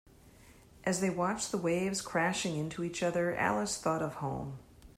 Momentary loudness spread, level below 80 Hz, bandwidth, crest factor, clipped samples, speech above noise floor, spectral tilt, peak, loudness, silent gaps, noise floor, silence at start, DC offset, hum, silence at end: 7 LU; -62 dBFS; 15.5 kHz; 18 dB; under 0.1%; 25 dB; -4.5 dB/octave; -16 dBFS; -33 LUFS; none; -58 dBFS; 0.25 s; under 0.1%; none; 0.1 s